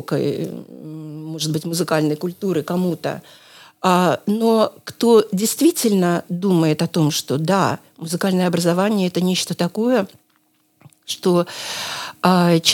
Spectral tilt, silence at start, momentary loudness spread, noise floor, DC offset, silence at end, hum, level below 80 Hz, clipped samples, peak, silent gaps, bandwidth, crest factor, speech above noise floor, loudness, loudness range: -5 dB/octave; 0 s; 12 LU; -62 dBFS; under 0.1%; 0 s; none; -72 dBFS; under 0.1%; 0 dBFS; none; 18.5 kHz; 18 dB; 43 dB; -19 LUFS; 5 LU